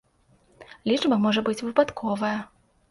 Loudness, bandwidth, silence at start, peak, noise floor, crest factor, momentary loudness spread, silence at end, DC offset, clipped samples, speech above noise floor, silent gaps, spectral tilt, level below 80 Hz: -25 LUFS; 11.5 kHz; 0.6 s; -6 dBFS; -62 dBFS; 20 dB; 11 LU; 0.45 s; under 0.1%; under 0.1%; 38 dB; none; -5.5 dB/octave; -62 dBFS